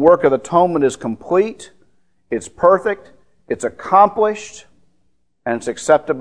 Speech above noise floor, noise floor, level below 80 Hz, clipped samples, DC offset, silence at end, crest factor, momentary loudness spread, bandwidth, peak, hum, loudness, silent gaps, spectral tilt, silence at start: 49 dB; -65 dBFS; -54 dBFS; under 0.1%; 0.3%; 0 s; 18 dB; 15 LU; 10.5 kHz; 0 dBFS; none; -17 LUFS; none; -5.5 dB/octave; 0 s